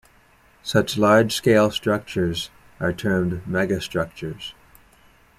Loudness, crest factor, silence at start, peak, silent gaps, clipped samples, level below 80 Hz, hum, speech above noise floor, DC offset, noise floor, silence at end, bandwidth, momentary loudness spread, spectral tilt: -21 LUFS; 20 dB; 0.65 s; -4 dBFS; none; under 0.1%; -50 dBFS; none; 34 dB; under 0.1%; -55 dBFS; 0.85 s; 15.5 kHz; 15 LU; -5.5 dB/octave